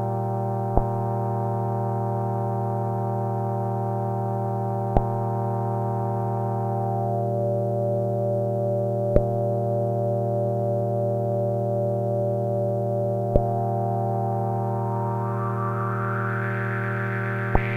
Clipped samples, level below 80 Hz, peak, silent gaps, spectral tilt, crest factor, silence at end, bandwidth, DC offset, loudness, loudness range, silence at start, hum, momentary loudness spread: under 0.1%; -38 dBFS; 0 dBFS; none; -10 dB/octave; 24 dB; 0 s; 3.5 kHz; under 0.1%; -25 LUFS; 2 LU; 0 s; none; 2 LU